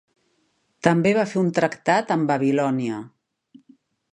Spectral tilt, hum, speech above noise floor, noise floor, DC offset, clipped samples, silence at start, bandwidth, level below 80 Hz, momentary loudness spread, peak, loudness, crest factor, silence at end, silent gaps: -6.5 dB/octave; none; 48 dB; -68 dBFS; under 0.1%; under 0.1%; 0.85 s; 11 kHz; -64 dBFS; 6 LU; -2 dBFS; -21 LUFS; 22 dB; 1.05 s; none